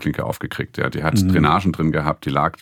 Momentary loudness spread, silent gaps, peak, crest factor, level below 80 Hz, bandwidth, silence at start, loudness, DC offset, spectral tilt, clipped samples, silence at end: 10 LU; none; 0 dBFS; 20 dB; -44 dBFS; 17.5 kHz; 0 s; -20 LUFS; under 0.1%; -6.5 dB/octave; under 0.1%; 0.1 s